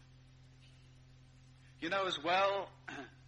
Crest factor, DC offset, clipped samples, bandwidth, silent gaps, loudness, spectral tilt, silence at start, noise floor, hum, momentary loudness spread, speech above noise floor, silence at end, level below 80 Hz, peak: 20 dB; under 0.1%; under 0.1%; 9.4 kHz; none; -36 LUFS; -4 dB/octave; 0.4 s; -60 dBFS; none; 16 LU; 24 dB; 0 s; -70 dBFS; -18 dBFS